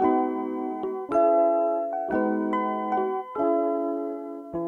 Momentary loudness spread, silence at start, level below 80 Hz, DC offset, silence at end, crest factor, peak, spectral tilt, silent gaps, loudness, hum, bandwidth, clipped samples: 10 LU; 0 s; -64 dBFS; under 0.1%; 0 s; 14 dB; -12 dBFS; -8.5 dB/octave; none; -26 LUFS; none; 6.6 kHz; under 0.1%